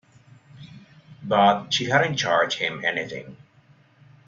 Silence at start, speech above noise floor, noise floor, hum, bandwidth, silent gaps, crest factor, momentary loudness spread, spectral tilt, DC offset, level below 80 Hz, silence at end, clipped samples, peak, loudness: 0.55 s; 34 dB; -57 dBFS; none; 7.8 kHz; none; 22 dB; 14 LU; -4 dB/octave; under 0.1%; -66 dBFS; 0.9 s; under 0.1%; -4 dBFS; -22 LUFS